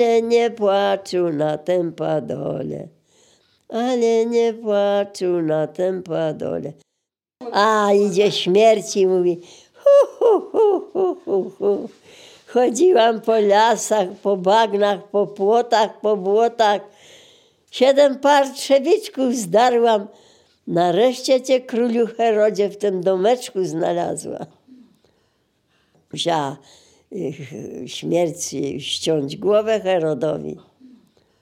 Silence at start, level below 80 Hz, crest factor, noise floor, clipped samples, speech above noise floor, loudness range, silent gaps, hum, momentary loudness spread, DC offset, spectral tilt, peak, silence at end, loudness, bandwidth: 0 s; -70 dBFS; 16 dB; -80 dBFS; under 0.1%; 61 dB; 8 LU; none; none; 14 LU; under 0.1%; -4.5 dB/octave; -2 dBFS; 0.85 s; -19 LUFS; 16 kHz